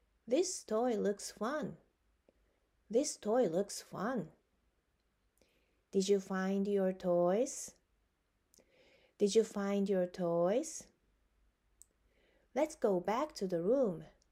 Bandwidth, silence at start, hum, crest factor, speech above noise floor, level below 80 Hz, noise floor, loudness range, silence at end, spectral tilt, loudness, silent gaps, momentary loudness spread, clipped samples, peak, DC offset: 16 kHz; 0.25 s; none; 18 dB; 45 dB; -74 dBFS; -79 dBFS; 3 LU; 0.25 s; -5 dB/octave; -35 LUFS; none; 9 LU; under 0.1%; -18 dBFS; under 0.1%